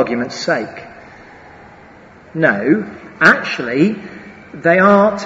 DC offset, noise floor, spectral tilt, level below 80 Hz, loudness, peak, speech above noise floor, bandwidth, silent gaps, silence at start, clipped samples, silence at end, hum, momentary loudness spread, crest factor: under 0.1%; -41 dBFS; -6 dB/octave; -54 dBFS; -14 LUFS; 0 dBFS; 27 dB; 8 kHz; none; 0 s; under 0.1%; 0 s; none; 21 LU; 16 dB